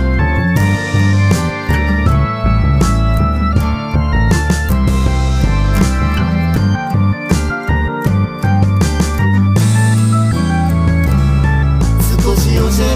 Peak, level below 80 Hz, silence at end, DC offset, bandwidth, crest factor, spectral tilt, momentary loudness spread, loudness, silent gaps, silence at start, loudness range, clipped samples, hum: -2 dBFS; -18 dBFS; 0 s; under 0.1%; 16 kHz; 10 dB; -6.5 dB/octave; 4 LU; -13 LUFS; none; 0 s; 2 LU; under 0.1%; none